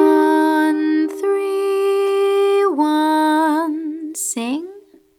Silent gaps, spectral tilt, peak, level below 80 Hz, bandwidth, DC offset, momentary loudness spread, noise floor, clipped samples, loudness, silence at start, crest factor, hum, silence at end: none; -2.5 dB/octave; -2 dBFS; -76 dBFS; 16 kHz; under 0.1%; 9 LU; -42 dBFS; under 0.1%; -17 LUFS; 0 s; 14 dB; none; 0.4 s